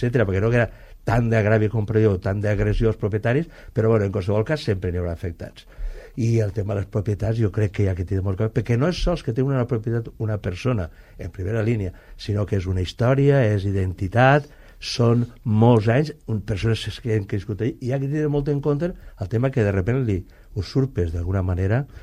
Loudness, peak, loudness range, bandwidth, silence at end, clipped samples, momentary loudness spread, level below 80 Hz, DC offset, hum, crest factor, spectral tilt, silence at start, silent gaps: -22 LUFS; -4 dBFS; 5 LU; 10.5 kHz; 0.05 s; under 0.1%; 10 LU; -38 dBFS; under 0.1%; none; 16 dB; -7.5 dB/octave; 0 s; none